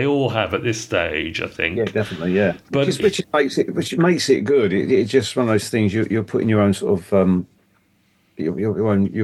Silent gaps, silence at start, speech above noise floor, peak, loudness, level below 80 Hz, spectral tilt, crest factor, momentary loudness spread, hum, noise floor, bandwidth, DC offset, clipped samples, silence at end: none; 0 s; 42 dB; -2 dBFS; -19 LUFS; -52 dBFS; -6 dB/octave; 18 dB; 5 LU; none; -61 dBFS; 12.5 kHz; under 0.1%; under 0.1%; 0 s